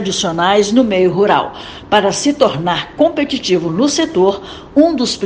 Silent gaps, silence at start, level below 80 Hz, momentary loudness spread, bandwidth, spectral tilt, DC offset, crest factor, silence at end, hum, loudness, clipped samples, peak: none; 0 s; -46 dBFS; 6 LU; 10 kHz; -4 dB/octave; under 0.1%; 14 dB; 0 s; none; -14 LUFS; 0.1%; 0 dBFS